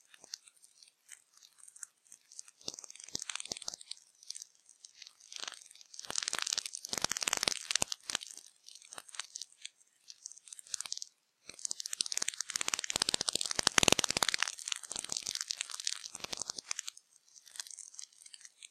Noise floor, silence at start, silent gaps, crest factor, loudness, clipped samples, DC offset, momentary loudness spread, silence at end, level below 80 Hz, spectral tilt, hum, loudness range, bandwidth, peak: -64 dBFS; 0.3 s; none; 36 dB; -35 LUFS; under 0.1%; under 0.1%; 21 LU; 0.05 s; -70 dBFS; 0 dB/octave; none; 13 LU; 16 kHz; -4 dBFS